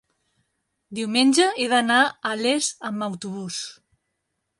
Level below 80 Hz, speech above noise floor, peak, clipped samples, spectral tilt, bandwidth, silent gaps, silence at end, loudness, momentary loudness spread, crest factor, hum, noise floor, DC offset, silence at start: -72 dBFS; 55 dB; -6 dBFS; under 0.1%; -2.5 dB/octave; 11.5 kHz; none; 0.85 s; -22 LUFS; 14 LU; 18 dB; none; -78 dBFS; under 0.1%; 0.9 s